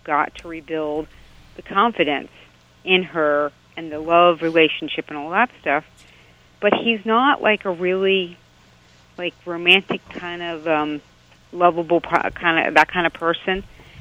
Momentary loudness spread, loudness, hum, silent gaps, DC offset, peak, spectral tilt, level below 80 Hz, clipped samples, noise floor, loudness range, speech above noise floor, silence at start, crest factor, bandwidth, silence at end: 14 LU; -19 LUFS; 60 Hz at -55 dBFS; none; under 0.1%; 0 dBFS; -5.5 dB/octave; -52 dBFS; under 0.1%; -52 dBFS; 3 LU; 32 dB; 0.05 s; 20 dB; 12.5 kHz; 0 s